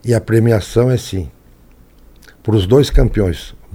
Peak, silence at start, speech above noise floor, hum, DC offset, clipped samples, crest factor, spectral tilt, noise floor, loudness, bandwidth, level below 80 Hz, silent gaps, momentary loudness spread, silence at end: 0 dBFS; 0.05 s; 32 dB; none; under 0.1%; under 0.1%; 16 dB; -7 dB/octave; -45 dBFS; -15 LUFS; 16 kHz; -24 dBFS; none; 14 LU; 0.25 s